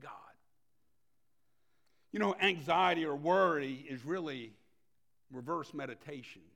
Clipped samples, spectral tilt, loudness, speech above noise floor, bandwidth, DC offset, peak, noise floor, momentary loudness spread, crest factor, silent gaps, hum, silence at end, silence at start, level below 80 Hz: under 0.1%; -5.5 dB/octave; -34 LUFS; 50 dB; 16.5 kHz; under 0.1%; -16 dBFS; -84 dBFS; 18 LU; 20 dB; none; none; 0.15 s; 0 s; -80 dBFS